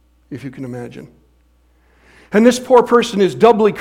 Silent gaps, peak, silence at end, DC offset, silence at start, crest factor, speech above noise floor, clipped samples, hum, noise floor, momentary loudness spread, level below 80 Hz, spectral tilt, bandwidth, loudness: none; 0 dBFS; 0 s; under 0.1%; 0.3 s; 16 dB; 41 dB; under 0.1%; 60 Hz at -50 dBFS; -54 dBFS; 20 LU; -52 dBFS; -5.5 dB/octave; 15.5 kHz; -13 LUFS